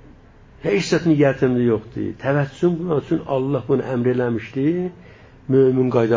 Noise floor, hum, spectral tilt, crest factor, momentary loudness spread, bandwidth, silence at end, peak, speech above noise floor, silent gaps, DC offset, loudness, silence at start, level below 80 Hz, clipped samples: -46 dBFS; none; -7.5 dB/octave; 16 dB; 9 LU; 7.6 kHz; 0 s; -4 dBFS; 28 dB; none; under 0.1%; -20 LUFS; 0.65 s; -50 dBFS; under 0.1%